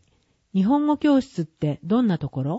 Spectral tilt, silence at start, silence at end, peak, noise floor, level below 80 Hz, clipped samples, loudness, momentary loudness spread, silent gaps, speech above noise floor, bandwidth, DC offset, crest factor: -8.5 dB/octave; 0.55 s; 0 s; -8 dBFS; -65 dBFS; -56 dBFS; under 0.1%; -22 LUFS; 8 LU; none; 44 dB; 8 kHz; under 0.1%; 14 dB